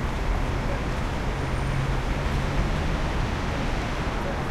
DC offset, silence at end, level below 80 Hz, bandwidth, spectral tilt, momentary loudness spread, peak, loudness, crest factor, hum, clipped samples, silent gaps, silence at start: under 0.1%; 0 s; -28 dBFS; 13 kHz; -6 dB/octave; 2 LU; -12 dBFS; -28 LUFS; 14 dB; none; under 0.1%; none; 0 s